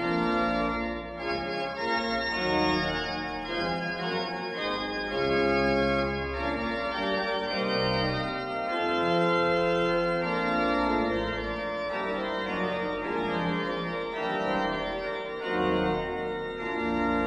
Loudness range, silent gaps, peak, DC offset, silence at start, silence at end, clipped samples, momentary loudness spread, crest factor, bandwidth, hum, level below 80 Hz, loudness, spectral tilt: 3 LU; none; -14 dBFS; under 0.1%; 0 s; 0 s; under 0.1%; 7 LU; 16 dB; 11 kHz; none; -48 dBFS; -28 LUFS; -6 dB/octave